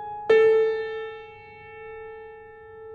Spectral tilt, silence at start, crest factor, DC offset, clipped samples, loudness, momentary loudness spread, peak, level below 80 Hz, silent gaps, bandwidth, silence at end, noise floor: -5 dB/octave; 0 s; 16 dB; under 0.1%; under 0.1%; -21 LUFS; 26 LU; -8 dBFS; -62 dBFS; none; 6.8 kHz; 0 s; -44 dBFS